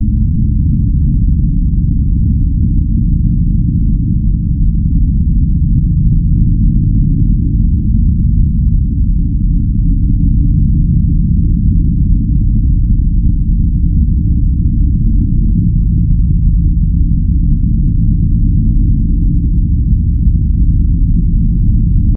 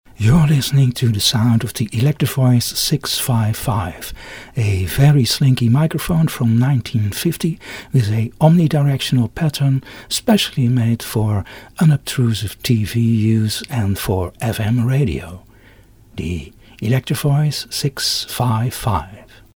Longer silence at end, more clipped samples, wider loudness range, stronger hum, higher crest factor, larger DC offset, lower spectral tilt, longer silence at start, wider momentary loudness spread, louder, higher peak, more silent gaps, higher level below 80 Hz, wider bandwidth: second, 0 s vs 0.3 s; neither; second, 1 LU vs 5 LU; neither; second, 10 dB vs 16 dB; neither; first, -25.5 dB/octave vs -5.5 dB/octave; second, 0 s vs 0.2 s; second, 2 LU vs 9 LU; first, -13 LUFS vs -17 LUFS; about the same, 0 dBFS vs 0 dBFS; neither; first, -12 dBFS vs -40 dBFS; second, 0.4 kHz vs over 20 kHz